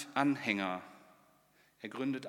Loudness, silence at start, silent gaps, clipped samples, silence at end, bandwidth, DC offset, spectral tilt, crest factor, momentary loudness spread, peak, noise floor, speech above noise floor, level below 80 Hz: -35 LUFS; 0 s; none; under 0.1%; 0 s; 14 kHz; under 0.1%; -5 dB/octave; 22 dB; 17 LU; -16 dBFS; -69 dBFS; 34 dB; -88 dBFS